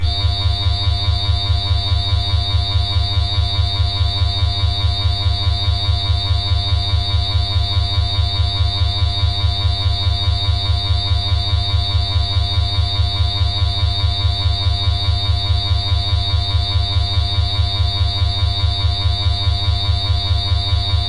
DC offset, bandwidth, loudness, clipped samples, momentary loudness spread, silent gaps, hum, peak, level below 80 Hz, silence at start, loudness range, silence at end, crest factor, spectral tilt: under 0.1%; 11 kHz; -17 LUFS; under 0.1%; 0 LU; none; none; -6 dBFS; -22 dBFS; 0 s; 0 LU; 0 s; 10 dB; -5 dB/octave